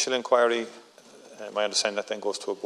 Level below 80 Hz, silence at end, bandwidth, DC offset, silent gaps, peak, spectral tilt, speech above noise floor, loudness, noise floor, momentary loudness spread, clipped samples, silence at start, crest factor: -86 dBFS; 0 s; 12.5 kHz; under 0.1%; none; -8 dBFS; -1 dB/octave; 24 dB; -26 LUFS; -51 dBFS; 13 LU; under 0.1%; 0 s; 20 dB